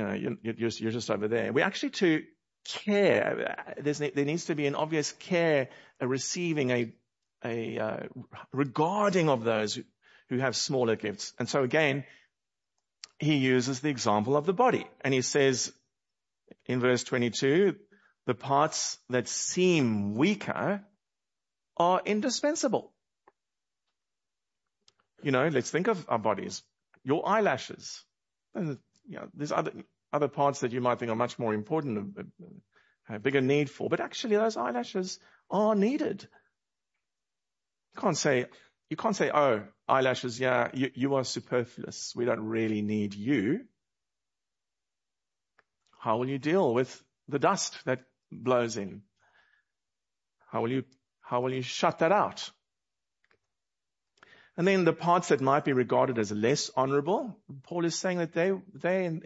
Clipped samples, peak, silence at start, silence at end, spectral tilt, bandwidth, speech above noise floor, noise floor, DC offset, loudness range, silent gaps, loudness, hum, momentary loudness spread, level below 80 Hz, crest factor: under 0.1%; -8 dBFS; 0 s; 0.05 s; -5 dB/octave; 8 kHz; over 61 dB; under -90 dBFS; under 0.1%; 5 LU; none; -29 LUFS; none; 12 LU; -76 dBFS; 22 dB